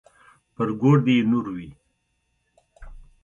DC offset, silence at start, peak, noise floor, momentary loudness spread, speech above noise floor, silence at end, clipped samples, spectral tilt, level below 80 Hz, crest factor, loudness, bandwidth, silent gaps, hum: under 0.1%; 0.6 s; -6 dBFS; -72 dBFS; 18 LU; 52 dB; 0.3 s; under 0.1%; -8.5 dB/octave; -52 dBFS; 18 dB; -21 LUFS; 7.2 kHz; none; none